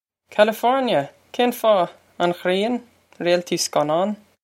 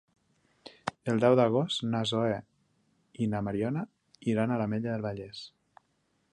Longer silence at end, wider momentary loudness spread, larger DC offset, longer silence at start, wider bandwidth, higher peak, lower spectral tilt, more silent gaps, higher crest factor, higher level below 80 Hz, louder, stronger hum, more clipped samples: second, 0.3 s vs 0.85 s; second, 9 LU vs 15 LU; neither; second, 0.3 s vs 0.65 s; first, 16.5 kHz vs 10.5 kHz; first, -2 dBFS vs -10 dBFS; second, -4 dB/octave vs -6.5 dB/octave; neither; about the same, 20 dB vs 22 dB; second, -74 dBFS vs -64 dBFS; first, -21 LUFS vs -30 LUFS; neither; neither